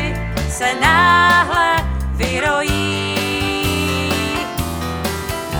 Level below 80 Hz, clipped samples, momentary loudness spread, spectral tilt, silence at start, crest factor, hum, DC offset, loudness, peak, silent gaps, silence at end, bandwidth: -28 dBFS; under 0.1%; 11 LU; -4 dB/octave; 0 s; 16 dB; none; under 0.1%; -16 LUFS; 0 dBFS; none; 0 s; over 20 kHz